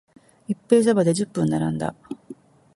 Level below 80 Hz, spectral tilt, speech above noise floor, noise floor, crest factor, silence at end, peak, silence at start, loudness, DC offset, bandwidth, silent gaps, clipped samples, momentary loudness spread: -58 dBFS; -6.5 dB/octave; 24 dB; -45 dBFS; 20 dB; 0.45 s; -4 dBFS; 0.5 s; -22 LUFS; under 0.1%; 11.5 kHz; none; under 0.1%; 20 LU